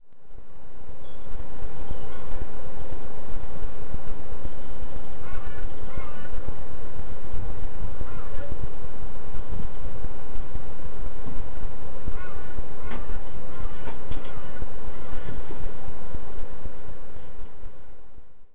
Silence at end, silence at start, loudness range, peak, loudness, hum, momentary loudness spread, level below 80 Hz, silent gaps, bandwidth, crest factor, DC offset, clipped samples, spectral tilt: 0 s; 0 s; 3 LU; -8 dBFS; -40 LUFS; none; 9 LU; -38 dBFS; none; 4 kHz; 10 dB; 20%; under 0.1%; -9 dB/octave